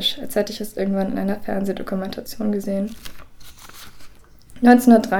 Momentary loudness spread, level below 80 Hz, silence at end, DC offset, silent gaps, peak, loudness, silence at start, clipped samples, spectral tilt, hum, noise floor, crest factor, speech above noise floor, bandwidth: 27 LU; -48 dBFS; 0 s; under 0.1%; none; 0 dBFS; -20 LUFS; 0 s; under 0.1%; -5.5 dB/octave; none; -43 dBFS; 20 dB; 24 dB; 18.5 kHz